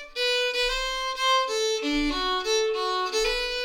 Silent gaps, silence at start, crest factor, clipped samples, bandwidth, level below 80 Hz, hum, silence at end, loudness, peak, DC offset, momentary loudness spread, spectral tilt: none; 0 s; 12 dB; under 0.1%; 17.5 kHz; -44 dBFS; none; 0 s; -25 LUFS; -14 dBFS; under 0.1%; 3 LU; -1 dB/octave